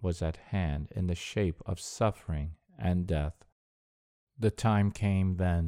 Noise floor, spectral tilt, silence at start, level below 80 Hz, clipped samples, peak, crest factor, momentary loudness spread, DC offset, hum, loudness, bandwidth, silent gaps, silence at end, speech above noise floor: under -90 dBFS; -7 dB/octave; 0 s; -44 dBFS; under 0.1%; -12 dBFS; 18 dB; 9 LU; under 0.1%; none; -32 LUFS; 13 kHz; 3.52-4.27 s; 0 s; over 60 dB